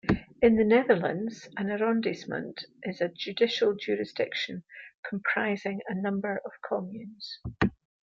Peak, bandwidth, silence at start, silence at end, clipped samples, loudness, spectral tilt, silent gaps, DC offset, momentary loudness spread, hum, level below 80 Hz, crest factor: -10 dBFS; 7.4 kHz; 0.05 s; 0.3 s; under 0.1%; -29 LUFS; -6.5 dB/octave; 4.95-5.03 s; under 0.1%; 16 LU; none; -54 dBFS; 20 dB